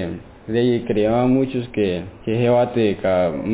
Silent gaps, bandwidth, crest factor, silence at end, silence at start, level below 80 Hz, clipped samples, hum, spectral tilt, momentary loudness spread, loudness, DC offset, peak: none; 4 kHz; 12 dB; 0 s; 0 s; -44 dBFS; under 0.1%; none; -11.5 dB/octave; 8 LU; -19 LUFS; under 0.1%; -6 dBFS